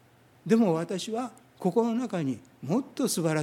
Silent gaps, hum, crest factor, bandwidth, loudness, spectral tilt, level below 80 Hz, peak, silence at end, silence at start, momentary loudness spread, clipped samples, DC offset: none; none; 18 dB; 16 kHz; -28 LUFS; -5.5 dB/octave; -76 dBFS; -10 dBFS; 0 s; 0.45 s; 11 LU; under 0.1%; under 0.1%